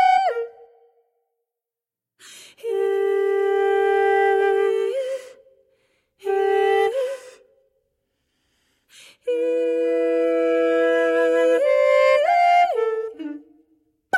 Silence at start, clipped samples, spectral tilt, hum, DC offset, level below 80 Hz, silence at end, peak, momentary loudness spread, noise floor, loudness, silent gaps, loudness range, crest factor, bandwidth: 0 s; under 0.1%; -3 dB/octave; none; under 0.1%; -66 dBFS; 0 s; -8 dBFS; 15 LU; -89 dBFS; -20 LUFS; none; 8 LU; 14 dB; 12 kHz